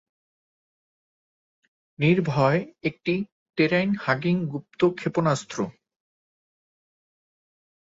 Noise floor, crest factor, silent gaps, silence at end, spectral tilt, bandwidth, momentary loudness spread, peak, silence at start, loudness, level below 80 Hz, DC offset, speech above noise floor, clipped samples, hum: under -90 dBFS; 20 dB; 3.32-3.46 s; 2.25 s; -6.5 dB/octave; 8 kHz; 10 LU; -6 dBFS; 2 s; -25 LUFS; -64 dBFS; under 0.1%; over 66 dB; under 0.1%; none